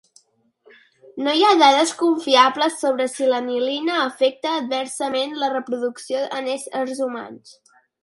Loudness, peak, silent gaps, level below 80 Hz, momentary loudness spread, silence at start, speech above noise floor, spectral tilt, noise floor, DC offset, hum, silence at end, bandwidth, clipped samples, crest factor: -20 LUFS; 0 dBFS; none; -76 dBFS; 11 LU; 1.15 s; 42 dB; -1.5 dB/octave; -62 dBFS; under 0.1%; none; 0.5 s; 11.5 kHz; under 0.1%; 20 dB